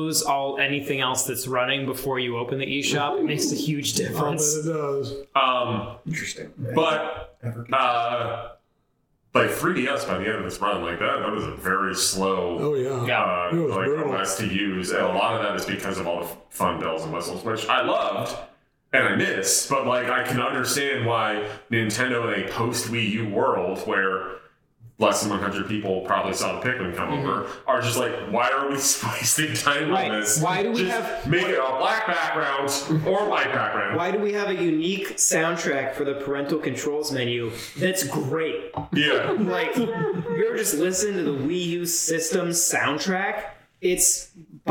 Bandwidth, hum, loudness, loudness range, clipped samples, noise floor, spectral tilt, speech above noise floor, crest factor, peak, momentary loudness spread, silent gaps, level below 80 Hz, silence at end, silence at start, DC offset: 19.5 kHz; none; -24 LUFS; 3 LU; under 0.1%; -69 dBFS; -3.5 dB/octave; 45 dB; 20 dB; -4 dBFS; 7 LU; none; -58 dBFS; 0 s; 0 s; under 0.1%